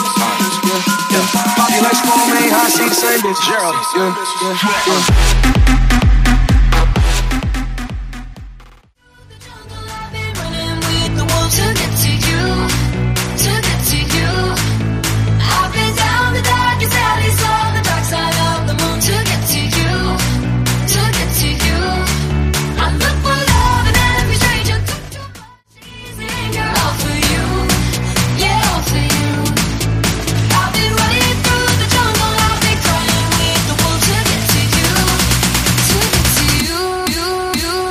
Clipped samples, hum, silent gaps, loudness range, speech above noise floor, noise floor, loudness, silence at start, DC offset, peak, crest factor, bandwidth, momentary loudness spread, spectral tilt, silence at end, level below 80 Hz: under 0.1%; none; none; 5 LU; 34 dB; -46 dBFS; -14 LUFS; 0 s; under 0.1%; 0 dBFS; 14 dB; 15.5 kHz; 6 LU; -3.5 dB/octave; 0 s; -20 dBFS